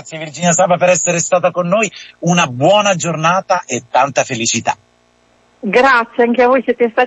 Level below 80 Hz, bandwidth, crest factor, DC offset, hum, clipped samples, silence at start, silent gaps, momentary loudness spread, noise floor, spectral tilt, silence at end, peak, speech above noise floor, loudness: -56 dBFS; 8.6 kHz; 14 dB; under 0.1%; none; under 0.1%; 0.05 s; none; 7 LU; -54 dBFS; -3.5 dB/octave; 0 s; 0 dBFS; 41 dB; -13 LUFS